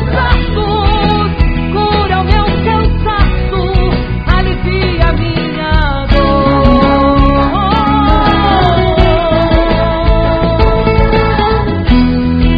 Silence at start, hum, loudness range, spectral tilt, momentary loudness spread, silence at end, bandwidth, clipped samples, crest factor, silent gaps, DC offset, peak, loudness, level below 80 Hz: 0 s; none; 3 LU; -9 dB/octave; 4 LU; 0 s; 5.2 kHz; 0.4%; 10 dB; none; under 0.1%; 0 dBFS; -11 LUFS; -14 dBFS